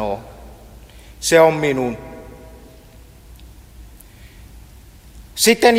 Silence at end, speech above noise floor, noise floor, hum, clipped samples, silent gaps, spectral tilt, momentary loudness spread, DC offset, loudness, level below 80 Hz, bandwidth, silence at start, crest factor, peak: 0 s; 28 dB; -43 dBFS; none; under 0.1%; none; -3.5 dB/octave; 27 LU; under 0.1%; -16 LUFS; -44 dBFS; 16.5 kHz; 0 s; 20 dB; 0 dBFS